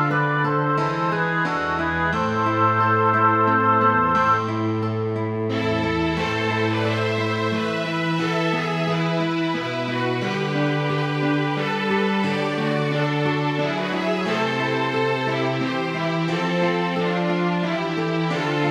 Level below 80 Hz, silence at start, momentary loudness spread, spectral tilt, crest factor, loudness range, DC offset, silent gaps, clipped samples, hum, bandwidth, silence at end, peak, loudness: -52 dBFS; 0 s; 6 LU; -6.5 dB/octave; 16 dB; 4 LU; under 0.1%; none; under 0.1%; none; 12 kHz; 0 s; -6 dBFS; -21 LUFS